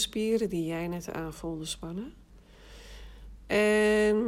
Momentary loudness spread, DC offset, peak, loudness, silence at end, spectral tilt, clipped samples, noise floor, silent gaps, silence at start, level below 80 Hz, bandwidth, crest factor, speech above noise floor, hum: 25 LU; under 0.1%; -14 dBFS; -29 LUFS; 0 s; -4.5 dB/octave; under 0.1%; -53 dBFS; none; 0 s; -50 dBFS; 16 kHz; 16 dB; 25 dB; none